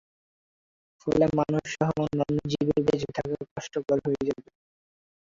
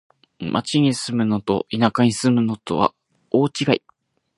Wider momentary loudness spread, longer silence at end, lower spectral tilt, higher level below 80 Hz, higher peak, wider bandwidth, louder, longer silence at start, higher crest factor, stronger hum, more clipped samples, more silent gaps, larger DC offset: first, 10 LU vs 6 LU; first, 0.9 s vs 0.6 s; first, -7 dB/octave vs -5.5 dB/octave; about the same, -56 dBFS vs -56 dBFS; second, -8 dBFS vs 0 dBFS; second, 7.6 kHz vs 11.5 kHz; second, -27 LUFS vs -20 LUFS; first, 1.05 s vs 0.4 s; about the same, 20 dB vs 20 dB; neither; neither; first, 3.51-3.56 s vs none; neither